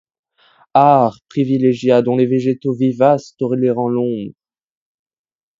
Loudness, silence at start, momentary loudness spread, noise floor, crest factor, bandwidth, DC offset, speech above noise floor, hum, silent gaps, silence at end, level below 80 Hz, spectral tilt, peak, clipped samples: -15 LUFS; 0.75 s; 9 LU; -54 dBFS; 16 dB; 7.6 kHz; under 0.1%; 39 dB; none; none; 1.3 s; -64 dBFS; -8.5 dB/octave; 0 dBFS; under 0.1%